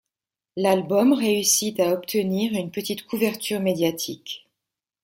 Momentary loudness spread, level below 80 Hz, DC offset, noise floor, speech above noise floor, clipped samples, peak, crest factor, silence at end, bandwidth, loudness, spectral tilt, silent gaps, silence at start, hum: 12 LU; -68 dBFS; under 0.1%; -87 dBFS; 64 dB; under 0.1%; -6 dBFS; 18 dB; 0.65 s; 16.5 kHz; -22 LUFS; -3.5 dB/octave; none; 0.55 s; none